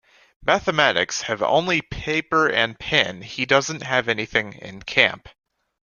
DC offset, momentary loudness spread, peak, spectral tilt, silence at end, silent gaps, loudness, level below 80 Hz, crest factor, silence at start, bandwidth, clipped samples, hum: under 0.1%; 7 LU; 0 dBFS; -3 dB/octave; 0.6 s; none; -20 LUFS; -50 dBFS; 22 dB; 0.4 s; 10.5 kHz; under 0.1%; none